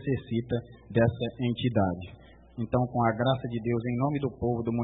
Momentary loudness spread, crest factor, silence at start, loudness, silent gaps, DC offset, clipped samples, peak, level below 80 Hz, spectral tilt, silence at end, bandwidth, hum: 8 LU; 18 dB; 0 s; -29 LUFS; none; under 0.1%; under 0.1%; -10 dBFS; -54 dBFS; -11.5 dB/octave; 0 s; 4 kHz; none